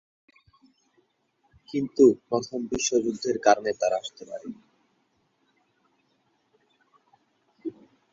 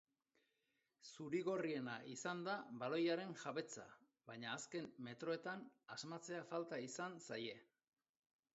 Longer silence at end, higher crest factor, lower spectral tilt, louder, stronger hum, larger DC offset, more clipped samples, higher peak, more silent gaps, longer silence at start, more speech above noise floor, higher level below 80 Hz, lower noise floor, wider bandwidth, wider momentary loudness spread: second, 0.4 s vs 0.9 s; first, 24 dB vs 18 dB; about the same, -4 dB/octave vs -3.5 dB/octave; first, -25 LUFS vs -47 LUFS; neither; neither; neither; first, -4 dBFS vs -30 dBFS; neither; first, 1.75 s vs 1.05 s; first, 46 dB vs 40 dB; first, -64 dBFS vs under -90 dBFS; second, -71 dBFS vs -87 dBFS; about the same, 7.8 kHz vs 8 kHz; first, 20 LU vs 13 LU